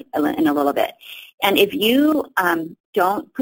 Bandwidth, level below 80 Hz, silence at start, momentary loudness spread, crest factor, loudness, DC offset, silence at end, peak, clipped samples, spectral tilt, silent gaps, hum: 17 kHz; -60 dBFS; 0.15 s; 9 LU; 18 dB; -19 LUFS; under 0.1%; 0 s; -2 dBFS; under 0.1%; -4 dB/octave; 1.34-1.38 s, 2.80-2.93 s; none